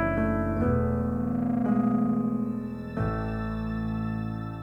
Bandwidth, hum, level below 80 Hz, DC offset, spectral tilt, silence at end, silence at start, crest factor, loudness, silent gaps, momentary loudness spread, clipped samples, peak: 5.6 kHz; none; -40 dBFS; under 0.1%; -10 dB/octave; 0 s; 0 s; 14 dB; -28 LUFS; none; 7 LU; under 0.1%; -12 dBFS